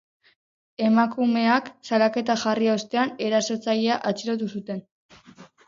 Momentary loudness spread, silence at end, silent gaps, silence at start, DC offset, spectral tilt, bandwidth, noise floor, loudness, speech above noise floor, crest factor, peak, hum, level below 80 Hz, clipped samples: 9 LU; 0.2 s; 4.91-5.09 s; 0.8 s; under 0.1%; -4.5 dB/octave; 7.6 kHz; -50 dBFS; -23 LUFS; 27 dB; 18 dB; -6 dBFS; none; -72 dBFS; under 0.1%